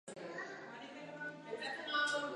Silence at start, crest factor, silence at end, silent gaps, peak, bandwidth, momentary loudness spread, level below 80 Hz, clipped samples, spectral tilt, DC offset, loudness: 0.05 s; 20 dB; 0 s; none; -24 dBFS; 11 kHz; 14 LU; under -90 dBFS; under 0.1%; -2.5 dB/octave; under 0.1%; -42 LUFS